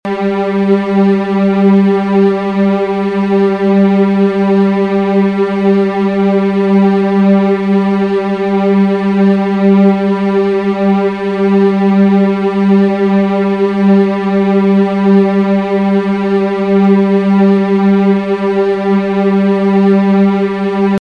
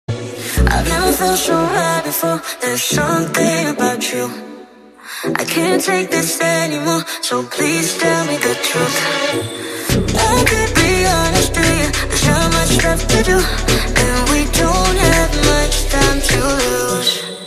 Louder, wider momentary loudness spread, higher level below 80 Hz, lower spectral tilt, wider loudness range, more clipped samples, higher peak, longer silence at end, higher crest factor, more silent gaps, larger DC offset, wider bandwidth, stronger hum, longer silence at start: first, -11 LUFS vs -15 LUFS; about the same, 4 LU vs 6 LU; second, -50 dBFS vs -24 dBFS; first, -9 dB/octave vs -3.5 dB/octave; second, 1 LU vs 4 LU; neither; about the same, 0 dBFS vs 0 dBFS; about the same, 0.05 s vs 0 s; second, 10 dB vs 16 dB; neither; neither; second, 5.6 kHz vs 14 kHz; neither; about the same, 0.05 s vs 0.1 s